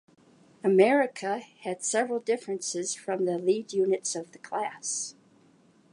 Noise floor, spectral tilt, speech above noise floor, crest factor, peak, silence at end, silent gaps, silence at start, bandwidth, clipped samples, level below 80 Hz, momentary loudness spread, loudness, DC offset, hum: -61 dBFS; -3.5 dB/octave; 33 dB; 22 dB; -8 dBFS; 0.8 s; none; 0.65 s; 11.5 kHz; under 0.1%; -84 dBFS; 11 LU; -28 LUFS; under 0.1%; none